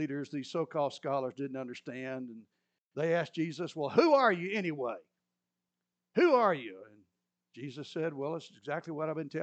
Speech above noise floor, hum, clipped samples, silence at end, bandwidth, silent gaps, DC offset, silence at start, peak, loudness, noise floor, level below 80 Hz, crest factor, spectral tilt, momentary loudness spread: 56 dB; 60 Hz at -65 dBFS; under 0.1%; 0 s; 8.6 kHz; 2.80-2.91 s; under 0.1%; 0 s; -12 dBFS; -32 LUFS; -88 dBFS; under -90 dBFS; 20 dB; -6.5 dB/octave; 18 LU